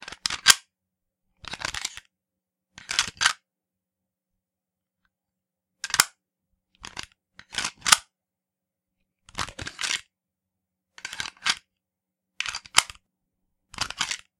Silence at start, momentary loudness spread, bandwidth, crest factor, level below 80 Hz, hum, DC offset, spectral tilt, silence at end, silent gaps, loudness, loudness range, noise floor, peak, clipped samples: 0 s; 19 LU; 16 kHz; 30 dB; -58 dBFS; none; under 0.1%; 1.5 dB/octave; 0.2 s; none; -25 LUFS; 6 LU; -88 dBFS; 0 dBFS; under 0.1%